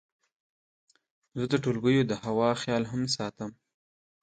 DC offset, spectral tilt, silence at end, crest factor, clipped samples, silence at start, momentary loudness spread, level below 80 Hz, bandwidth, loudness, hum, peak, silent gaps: under 0.1%; -5.5 dB/octave; 0.7 s; 20 dB; under 0.1%; 1.35 s; 14 LU; -64 dBFS; 9.2 kHz; -28 LUFS; none; -12 dBFS; none